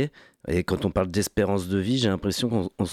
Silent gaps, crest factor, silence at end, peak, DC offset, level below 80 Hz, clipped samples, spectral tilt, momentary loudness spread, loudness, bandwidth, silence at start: none; 14 dB; 0 s; -12 dBFS; under 0.1%; -44 dBFS; under 0.1%; -5.5 dB/octave; 5 LU; -25 LUFS; 16 kHz; 0 s